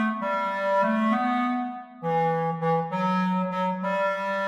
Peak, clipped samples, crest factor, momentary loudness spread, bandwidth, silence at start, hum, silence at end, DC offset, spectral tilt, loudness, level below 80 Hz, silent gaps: -14 dBFS; under 0.1%; 12 dB; 5 LU; 10.5 kHz; 0 s; none; 0 s; under 0.1%; -7.5 dB/octave; -25 LUFS; -74 dBFS; none